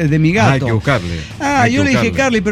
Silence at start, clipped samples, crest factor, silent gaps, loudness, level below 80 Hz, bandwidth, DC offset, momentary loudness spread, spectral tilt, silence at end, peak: 0 s; under 0.1%; 12 dB; none; -14 LUFS; -34 dBFS; 13.5 kHz; under 0.1%; 6 LU; -6 dB/octave; 0 s; -2 dBFS